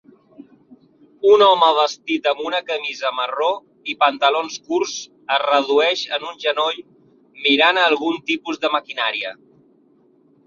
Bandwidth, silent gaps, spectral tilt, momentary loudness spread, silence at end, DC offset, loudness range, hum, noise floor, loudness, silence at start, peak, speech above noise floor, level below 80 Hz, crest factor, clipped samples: 7.4 kHz; none; -2 dB/octave; 11 LU; 1.15 s; under 0.1%; 3 LU; none; -56 dBFS; -18 LUFS; 1.25 s; -2 dBFS; 37 dB; -72 dBFS; 18 dB; under 0.1%